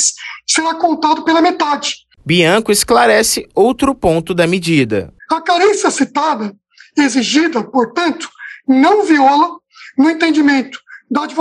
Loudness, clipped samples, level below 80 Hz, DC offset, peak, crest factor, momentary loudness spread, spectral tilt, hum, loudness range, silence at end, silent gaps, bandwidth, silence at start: -13 LUFS; under 0.1%; -46 dBFS; under 0.1%; 0 dBFS; 12 dB; 11 LU; -3.5 dB/octave; none; 2 LU; 0 s; none; 13 kHz; 0 s